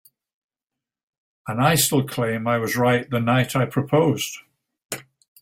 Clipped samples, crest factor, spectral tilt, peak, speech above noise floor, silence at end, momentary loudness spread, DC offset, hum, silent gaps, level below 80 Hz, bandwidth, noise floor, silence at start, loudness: under 0.1%; 20 dB; -4.5 dB/octave; -4 dBFS; 67 dB; 0.4 s; 16 LU; under 0.1%; none; 4.85-4.90 s; -58 dBFS; 16.5 kHz; -88 dBFS; 1.45 s; -21 LUFS